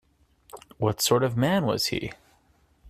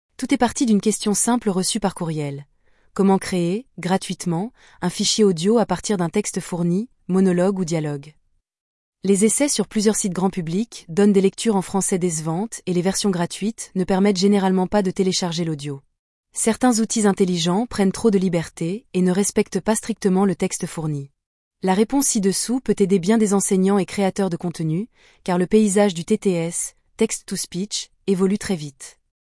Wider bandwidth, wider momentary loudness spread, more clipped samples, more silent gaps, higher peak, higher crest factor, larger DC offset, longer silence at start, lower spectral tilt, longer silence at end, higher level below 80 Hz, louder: first, 16 kHz vs 12 kHz; about the same, 8 LU vs 10 LU; neither; second, none vs 8.61-8.93 s, 15.99-16.23 s, 21.26-21.51 s; about the same, -8 dBFS vs -6 dBFS; about the same, 20 dB vs 16 dB; neither; first, 0.55 s vs 0.2 s; about the same, -4.5 dB/octave vs -5 dB/octave; second, 0 s vs 0.4 s; about the same, -56 dBFS vs -52 dBFS; second, -25 LUFS vs -20 LUFS